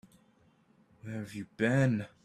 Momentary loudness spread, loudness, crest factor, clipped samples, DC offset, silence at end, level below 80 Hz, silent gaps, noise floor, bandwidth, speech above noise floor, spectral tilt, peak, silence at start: 16 LU; -32 LUFS; 20 dB; under 0.1%; under 0.1%; 0.2 s; -68 dBFS; none; -66 dBFS; 12.5 kHz; 35 dB; -7.5 dB/octave; -14 dBFS; 1.05 s